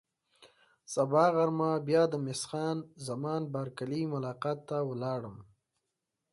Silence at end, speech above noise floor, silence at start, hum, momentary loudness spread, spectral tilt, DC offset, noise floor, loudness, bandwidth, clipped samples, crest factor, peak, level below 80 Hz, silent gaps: 0.9 s; 54 dB; 0.4 s; none; 11 LU; -6 dB/octave; under 0.1%; -86 dBFS; -32 LUFS; 11.5 kHz; under 0.1%; 20 dB; -14 dBFS; -74 dBFS; none